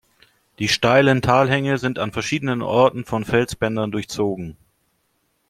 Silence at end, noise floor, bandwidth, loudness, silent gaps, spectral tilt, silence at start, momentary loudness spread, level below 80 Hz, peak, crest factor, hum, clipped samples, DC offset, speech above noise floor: 0.95 s; -68 dBFS; 15.5 kHz; -19 LUFS; none; -5.5 dB/octave; 0.6 s; 10 LU; -50 dBFS; -2 dBFS; 18 dB; none; under 0.1%; under 0.1%; 49 dB